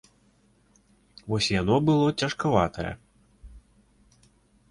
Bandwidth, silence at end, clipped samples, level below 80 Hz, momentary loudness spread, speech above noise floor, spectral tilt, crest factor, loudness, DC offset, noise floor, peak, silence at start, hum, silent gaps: 11.5 kHz; 1.1 s; under 0.1%; -50 dBFS; 14 LU; 39 dB; -5.5 dB/octave; 22 dB; -25 LUFS; under 0.1%; -63 dBFS; -6 dBFS; 1.25 s; none; none